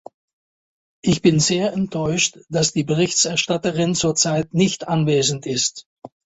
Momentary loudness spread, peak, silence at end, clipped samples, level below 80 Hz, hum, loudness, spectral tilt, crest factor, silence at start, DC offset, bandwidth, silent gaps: 5 LU; -2 dBFS; 0.3 s; under 0.1%; -52 dBFS; none; -19 LUFS; -4 dB/octave; 20 dB; 1.05 s; under 0.1%; 8.4 kHz; 5.86-5.96 s